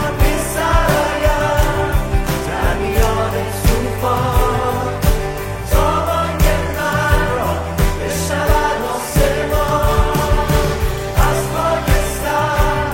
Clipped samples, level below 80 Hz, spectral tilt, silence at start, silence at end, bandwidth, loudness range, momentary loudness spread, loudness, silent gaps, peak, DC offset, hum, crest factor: under 0.1%; -20 dBFS; -5 dB/octave; 0 s; 0 s; 16.5 kHz; 1 LU; 4 LU; -17 LUFS; none; 0 dBFS; under 0.1%; none; 14 dB